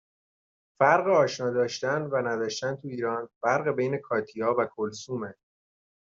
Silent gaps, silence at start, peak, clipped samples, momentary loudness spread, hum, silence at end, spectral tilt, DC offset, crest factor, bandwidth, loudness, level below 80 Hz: 3.36-3.41 s; 0.8 s; -8 dBFS; under 0.1%; 11 LU; none; 0.75 s; -5 dB/octave; under 0.1%; 20 dB; 7.8 kHz; -27 LUFS; -72 dBFS